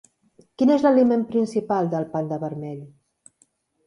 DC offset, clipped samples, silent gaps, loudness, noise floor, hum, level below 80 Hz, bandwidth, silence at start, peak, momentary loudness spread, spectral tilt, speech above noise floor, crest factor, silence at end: under 0.1%; under 0.1%; none; -21 LUFS; -64 dBFS; none; -68 dBFS; 10.5 kHz; 0.6 s; -6 dBFS; 15 LU; -8 dB/octave; 43 dB; 16 dB; 1 s